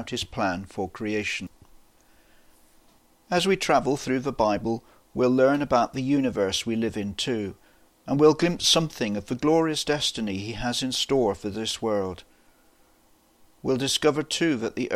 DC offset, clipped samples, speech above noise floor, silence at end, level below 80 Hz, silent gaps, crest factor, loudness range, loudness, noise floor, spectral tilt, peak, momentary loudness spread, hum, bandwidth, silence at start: under 0.1%; under 0.1%; 36 dB; 0 s; -52 dBFS; none; 20 dB; 5 LU; -25 LUFS; -60 dBFS; -4 dB/octave; -6 dBFS; 11 LU; none; 15.5 kHz; 0 s